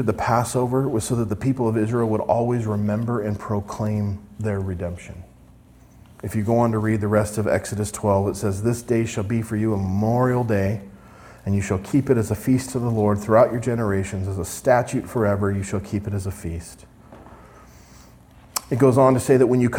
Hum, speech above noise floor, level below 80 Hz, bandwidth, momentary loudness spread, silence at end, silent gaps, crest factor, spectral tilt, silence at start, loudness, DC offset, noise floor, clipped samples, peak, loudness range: none; 28 dB; -48 dBFS; 17 kHz; 12 LU; 0 s; none; 18 dB; -7 dB/octave; 0 s; -22 LUFS; under 0.1%; -49 dBFS; under 0.1%; -2 dBFS; 6 LU